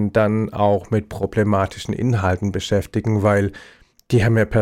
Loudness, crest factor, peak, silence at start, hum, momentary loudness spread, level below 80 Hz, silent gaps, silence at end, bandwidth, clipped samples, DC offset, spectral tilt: -20 LUFS; 14 dB; -6 dBFS; 0 s; none; 6 LU; -42 dBFS; none; 0 s; 14 kHz; under 0.1%; under 0.1%; -7 dB/octave